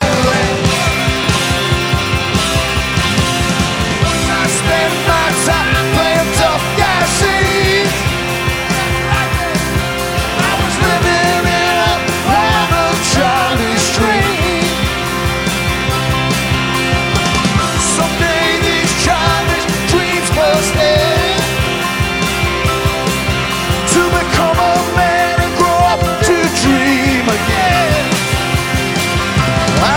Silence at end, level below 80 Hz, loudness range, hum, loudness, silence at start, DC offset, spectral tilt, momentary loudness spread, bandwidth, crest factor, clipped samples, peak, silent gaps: 0 s; -26 dBFS; 2 LU; none; -13 LUFS; 0 s; under 0.1%; -4 dB/octave; 3 LU; 17 kHz; 12 dB; under 0.1%; 0 dBFS; none